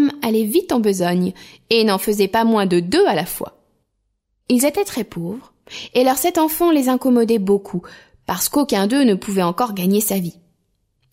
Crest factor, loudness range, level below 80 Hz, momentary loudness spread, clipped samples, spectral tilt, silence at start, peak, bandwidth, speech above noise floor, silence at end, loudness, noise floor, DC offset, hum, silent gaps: 16 dB; 3 LU; -54 dBFS; 13 LU; under 0.1%; -4.5 dB/octave; 0 s; -2 dBFS; 16.5 kHz; 53 dB; 0.8 s; -18 LUFS; -71 dBFS; under 0.1%; none; none